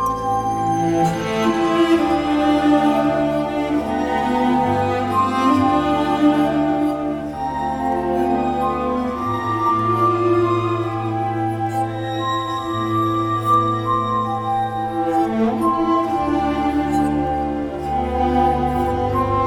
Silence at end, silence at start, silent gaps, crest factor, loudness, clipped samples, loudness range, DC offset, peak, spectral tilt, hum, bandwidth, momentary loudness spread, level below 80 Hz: 0 s; 0 s; none; 14 dB; -19 LUFS; under 0.1%; 3 LU; under 0.1%; -4 dBFS; -7 dB/octave; none; 16 kHz; 6 LU; -38 dBFS